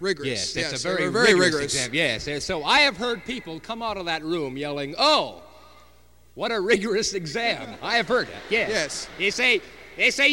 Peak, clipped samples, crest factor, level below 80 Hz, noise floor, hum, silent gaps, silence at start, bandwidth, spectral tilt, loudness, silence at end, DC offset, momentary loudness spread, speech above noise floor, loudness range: -6 dBFS; under 0.1%; 20 dB; -54 dBFS; -56 dBFS; none; none; 0 s; 16.5 kHz; -2.5 dB/octave; -23 LUFS; 0 s; 0.2%; 12 LU; 32 dB; 5 LU